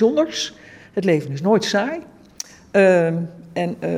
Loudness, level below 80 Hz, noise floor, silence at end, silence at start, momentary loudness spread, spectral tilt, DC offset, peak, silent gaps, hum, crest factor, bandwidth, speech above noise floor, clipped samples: -20 LUFS; -62 dBFS; -38 dBFS; 0 s; 0 s; 16 LU; -5.5 dB/octave; under 0.1%; -4 dBFS; none; none; 16 dB; 15.5 kHz; 19 dB; under 0.1%